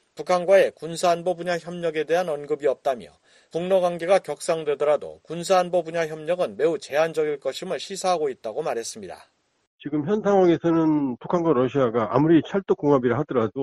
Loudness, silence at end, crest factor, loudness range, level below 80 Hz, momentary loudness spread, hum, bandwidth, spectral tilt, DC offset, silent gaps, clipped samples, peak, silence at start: -23 LUFS; 0 s; 18 dB; 5 LU; -62 dBFS; 11 LU; none; 13 kHz; -6 dB/octave; under 0.1%; 9.67-9.78 s; under 0.1%; -4 dBFS; 0.15 s